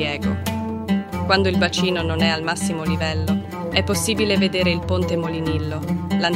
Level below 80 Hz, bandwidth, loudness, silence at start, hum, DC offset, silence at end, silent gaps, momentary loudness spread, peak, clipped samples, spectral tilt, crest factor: -42 dBFS; 16 kHz; -21 LUFS; 0 s; none; under 0.1%; 0 s; none; 6 LU; -2 dBFS; under 0.1%; -5 dB/octave; 18 dB